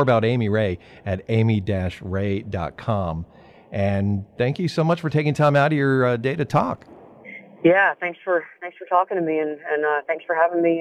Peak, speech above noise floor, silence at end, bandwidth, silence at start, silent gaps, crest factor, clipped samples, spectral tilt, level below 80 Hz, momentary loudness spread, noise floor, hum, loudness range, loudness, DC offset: -4 dBFS; 21 dB; 0 s; 10.5 kHz; 0 s; none; 18 dB; under 0.1%; -8 dB/octave; -50 dBFS; 11 LU; -42 dBFS; none; 4 LU; -22 LUFS; under 0.1%